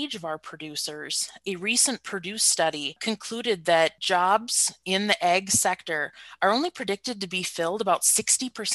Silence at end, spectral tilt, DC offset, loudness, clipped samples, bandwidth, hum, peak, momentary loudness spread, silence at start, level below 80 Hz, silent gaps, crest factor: 0 s; -1.5 dB/octave; under 0.1%; -24 LUFS; under 0.1%; 13.5 kHz; none; -4 dBFS; 10 LU; 0 s; -68 dBFS; none; 22 dB